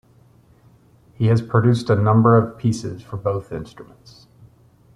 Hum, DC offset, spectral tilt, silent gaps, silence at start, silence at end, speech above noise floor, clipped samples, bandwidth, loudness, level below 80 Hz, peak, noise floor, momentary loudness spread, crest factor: none; under 0.1%; -8 dB/octave; none; 1.2 s; 1.15 s; 34 dB; under 0.1%; 10.5 kHz; -19 LUFS; -52 dBFS; -2 dBFS; -53 dBFS; 17 LU; 18 dB